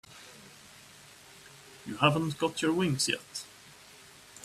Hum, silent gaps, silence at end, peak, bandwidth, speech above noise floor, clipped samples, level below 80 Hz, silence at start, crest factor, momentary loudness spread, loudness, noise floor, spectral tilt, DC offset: none; none; 0 s; -10 dBFS; 15 kHz; 24 dB; under 0.1%; -68 dBFS; 0.1 s; 24 dB; 24 LU; -29 LUFS; -54 dBFS; -4 dB/octave; under 0.1%